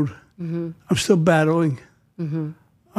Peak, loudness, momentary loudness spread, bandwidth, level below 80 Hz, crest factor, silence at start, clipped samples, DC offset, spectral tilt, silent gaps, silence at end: -4 dBFS; -21 LUFS; 16 LU; 13.5 kHz; -56 dBFS; 18 dB; 0 s; under 0.1%; under 0.1%; -6 dB/octave; none; 0 s